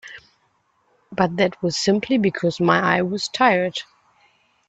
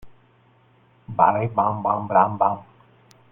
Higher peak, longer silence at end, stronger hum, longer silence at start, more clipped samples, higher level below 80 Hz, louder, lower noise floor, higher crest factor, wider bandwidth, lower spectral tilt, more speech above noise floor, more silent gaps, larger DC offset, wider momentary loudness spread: about the same, -2 dBFS vs -2 dBFS; first, 0.85 s vs 0.7 s; neither; about the same, 0.05 s vs 0.05 s; neither; about the same, -58 dBFS vs -60 dBFS; about the same, -20 LUFS vs -21 LUFS; first, -65 dBFS vs -57 dBFS; about the same, 20 dB vs 22 dB; first, 9 kHz vs 6.2 kHz; second, -5 dB/octave vs -9.5 dB/octave; first, 45 dB vs 37 dB; neither; neither; about the same, 9 LU vs 8 LU